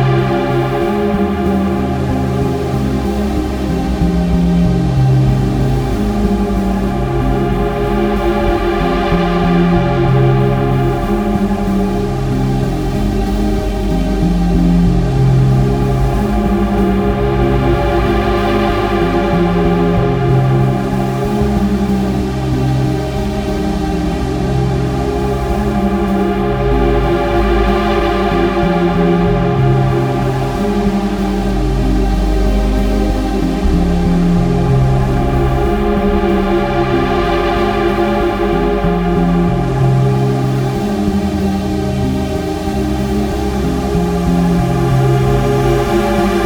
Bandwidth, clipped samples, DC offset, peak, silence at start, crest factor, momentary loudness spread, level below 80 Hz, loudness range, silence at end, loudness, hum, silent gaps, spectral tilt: 17 kHz; under 0.1%; under 0.1%; 0 dBFS; 0 s; 12 dB; 4 LU; -20 dBFS; 3 LU; 0 s; -14 LUFS; none; none; -7.5 dB/octave